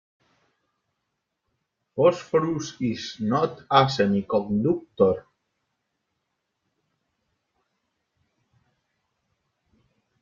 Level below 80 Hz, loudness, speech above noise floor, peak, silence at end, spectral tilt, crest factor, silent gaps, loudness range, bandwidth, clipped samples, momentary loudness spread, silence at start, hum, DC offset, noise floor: -64 dBFS; -24 LUFS; 57 dB; -4 dBFS; 5 s; -6 dB/octave; 24 dB; none; 6 LU; 7.4 kHz; under 0.1%; 9 LU; 1.95 s; none; under 0.1%; -80 dBFS